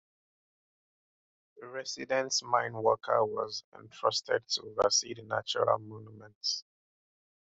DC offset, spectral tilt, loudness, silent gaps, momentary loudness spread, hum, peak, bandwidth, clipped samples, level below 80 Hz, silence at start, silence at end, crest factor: under 0.1%; -2 dB/octave; -31 LUFS; 3.64-3.72 s, 6.35-6.41 s; 14 LU; none; -12 dBFS; 8.2 kHz; under 0.1%; -74 dBFS; 1.55 s; 0.85 s; 22 dB